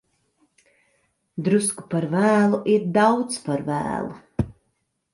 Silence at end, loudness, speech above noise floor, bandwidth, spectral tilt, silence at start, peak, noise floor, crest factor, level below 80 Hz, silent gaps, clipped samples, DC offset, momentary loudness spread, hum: 0.6 s; -22 LUFS; 52 dB; 11.5 kHz; -5.5 dB/octave; 1.35 s; -6 dBFS; -73 dBFS; 18 dB; -50 dBFS; none; under 0.1%; under 0.1%; 12 LU; none